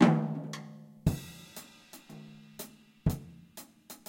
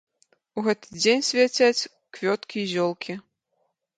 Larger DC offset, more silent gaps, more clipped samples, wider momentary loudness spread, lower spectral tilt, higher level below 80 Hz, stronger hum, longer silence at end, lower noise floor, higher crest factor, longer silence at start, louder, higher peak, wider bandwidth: neither; neither; neither; about the same, 17 LU vs 15 LU; first, -6.5 dB/octave vs -3 dB/octave; first, -50 dBFS vs -74 dBFS; neither; second, 0.15 s vs 0.8 s; second, -53 dBFS vs -74 dBFS; first, 26 dB vs 18 dB; second, 0 s vs 0.55 s; second, -35 LUFS vs -24 LUFS; about the same, -8 dBFS vs -6 dBFS; first, 16.5 kHz vs 9.4 kHz